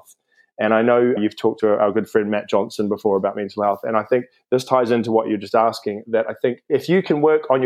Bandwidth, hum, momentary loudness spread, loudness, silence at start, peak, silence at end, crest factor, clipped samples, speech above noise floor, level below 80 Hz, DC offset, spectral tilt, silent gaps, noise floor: 14.5 kHz; none; 6 LU; -19 LUFS; 0.6 s; -2 dBFS; 0 s; 18 dB; under 0.1%; 36 dB; -72 dBFS; under 0.1%; -6.5 dB/octave; none; -55 dBFS